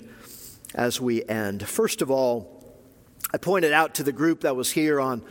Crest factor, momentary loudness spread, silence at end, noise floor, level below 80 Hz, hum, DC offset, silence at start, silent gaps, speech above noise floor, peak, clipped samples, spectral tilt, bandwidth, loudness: 22 dB; 14 LU; 0 s; -52 dBFS; -62 dBFS; none; under 0.1%; 0 s; none; 28 dB; -4 dBFS; under 0.1%; -4 dB/octave; 17 kHz; -24 LUFS